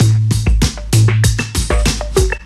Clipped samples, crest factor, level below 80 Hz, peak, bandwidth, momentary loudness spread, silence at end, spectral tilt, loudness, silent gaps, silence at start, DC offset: under 0.1%; 12 dB; -18 dBFS; 0 dBFS; 14 kHz; 4 LU; 0 s; -5 dB/octave; -14 LUFS; none; 0 s; under 0.1%